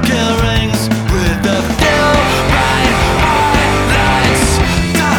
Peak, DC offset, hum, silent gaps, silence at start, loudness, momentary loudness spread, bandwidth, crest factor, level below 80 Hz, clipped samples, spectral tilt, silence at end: 0 dBFS; under 0.1%; none; none; 0 s; -12 LUFS; 4 LU; over 20 kHz; 12 dB; -20 dBFS; under 0.1%; -4.5 dB/octave; 0 s